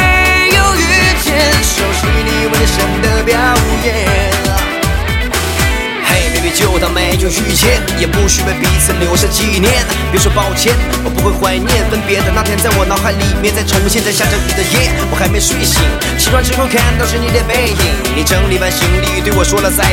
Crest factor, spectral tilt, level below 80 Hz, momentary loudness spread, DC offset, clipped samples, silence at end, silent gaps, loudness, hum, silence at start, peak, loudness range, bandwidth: 12 dB; -3.5 dB/octave; -18 dBFS; 4 LU; under 0.1%; under 0.1%; 0 s; none; -11 LUFS; none; 0 s; 0 dBFS; 2 LU; 17 kHz